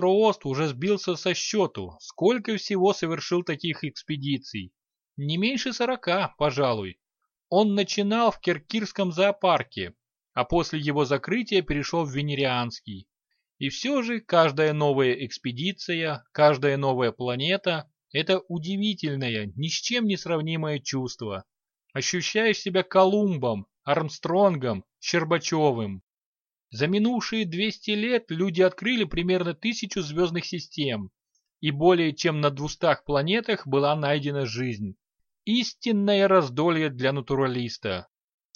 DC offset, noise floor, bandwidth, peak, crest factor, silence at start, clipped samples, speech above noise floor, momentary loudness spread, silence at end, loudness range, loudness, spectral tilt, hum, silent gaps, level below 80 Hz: under 0.1%; -83 dBFS; 7.2 kHz; -6 dBFS; 20 dB; 0 s; under 0.1%; 58 dB; 11 LU; 0.55 s; 3 LU; -25 LUFS; -5 dB/octave; none; 26.03-26.07 s, 26.25-26.35 s, 26.41-26.45 s; -54 dBFS